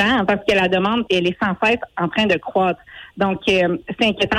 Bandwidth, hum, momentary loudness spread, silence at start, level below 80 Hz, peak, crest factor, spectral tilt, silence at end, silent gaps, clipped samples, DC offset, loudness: 12.5 kHz; none; 5 LU; 0 s; -48 dBFS; -6 dBFS; 12 dB; -5.5 dB/octave; 0 s; none; under 0.1%; under 0.1%; -18 LUFS